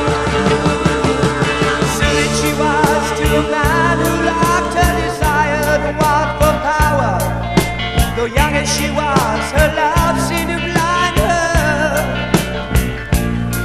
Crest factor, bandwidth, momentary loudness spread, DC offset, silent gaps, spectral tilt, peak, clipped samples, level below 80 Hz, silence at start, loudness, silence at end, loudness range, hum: 14 dB; 14 kHz; 3 LU; under 0.1%; none; -4.5 dB/octave; 0 dBFS; under 0.1%; -24 dBFS; 0 s; -15 LUFS; 0 s; 1 LU; none